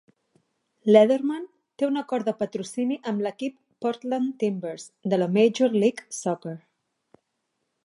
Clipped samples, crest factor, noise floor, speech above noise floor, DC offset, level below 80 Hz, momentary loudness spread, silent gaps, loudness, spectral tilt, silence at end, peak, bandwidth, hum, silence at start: under 0.1%; 22 dB; -78 dBFS; 54 dB; under 0.1%; -78 dBFS; 15 LU; none; -25 LUFS; -6 dB/octave; 1.25 s; -4 dBFS; 11.5 kHz; none; 0.85 s